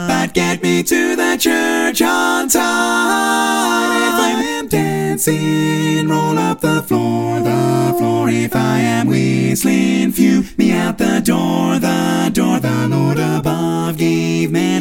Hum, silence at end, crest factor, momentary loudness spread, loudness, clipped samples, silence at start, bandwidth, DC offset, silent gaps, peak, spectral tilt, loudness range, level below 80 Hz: none; 0 s; 14 dB; 3 LU; -15 LUFS; under 0.1%; 0 s; 17 kHz; under 0.1%; none; 0 dBFS; -5 dB/octave; 2 LU; -46 dBFS